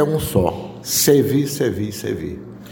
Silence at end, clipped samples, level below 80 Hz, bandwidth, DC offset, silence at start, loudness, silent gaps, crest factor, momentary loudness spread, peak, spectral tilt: 0 s; under 0.1%; -42 dBFS; 17 kHz; under 0.1%; 0 s; -19 LUFS; none; 18 dB; 15 LU; -2 dBFS; -4.5 dB/octave